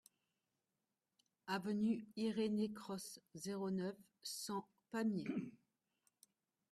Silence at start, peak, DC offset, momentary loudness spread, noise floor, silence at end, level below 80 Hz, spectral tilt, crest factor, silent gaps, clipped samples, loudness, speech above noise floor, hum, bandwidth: 1.45 s; -28 dBFS; under 0.1%; 11 LU; under -90 dBFS; 1.15 s; -84 dBFS; -5 dB/octave; 16 dB; none; under 0.1%; -44 LUFS; over 48 dB; none; 14 kHz